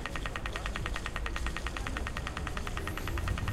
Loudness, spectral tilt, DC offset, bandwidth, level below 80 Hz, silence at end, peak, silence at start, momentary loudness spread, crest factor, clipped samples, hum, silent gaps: -37 LUFS; -4.5 dB/octave; under 0.1%; 15.5 kHz; -38 dBFS; 0 s; -16 dBFS; 0 s; 2 LU; 18 dB; under 0.1%; none; none